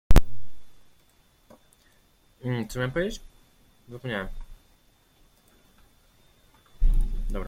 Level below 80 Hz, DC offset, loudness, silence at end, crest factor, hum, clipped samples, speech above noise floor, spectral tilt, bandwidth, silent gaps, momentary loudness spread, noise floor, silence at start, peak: -30 dBFS; under 0.1%; -30 LUFS; 0 s; 22 dB; none; under 0.1%; 31 dB; -6 dB/octave; 16 kHz; none; 23 LU; -62 dBFS; 0.1 s; -2 dBFS